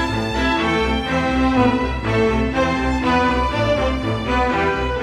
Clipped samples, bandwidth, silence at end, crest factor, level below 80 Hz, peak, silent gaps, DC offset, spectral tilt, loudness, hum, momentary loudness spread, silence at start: under 0.1%; 11.5 kHz; 0 s; 14 dB; -28 dBFS; -4 dBFS; none; under 0.1%; -6 dB/octave; -19 LUFS; none; 3 LU; 0 s